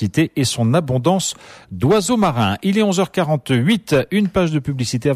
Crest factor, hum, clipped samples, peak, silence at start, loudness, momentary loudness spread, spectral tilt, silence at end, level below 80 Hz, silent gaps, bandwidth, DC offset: 14 dB; none; under 0.1%; -4 dBFS; 0 s; -17 LUFS; 5 LU; -5.5 dB/octave; 0 s; -46 dBFS; none; 15.5 kHz; under 0.1%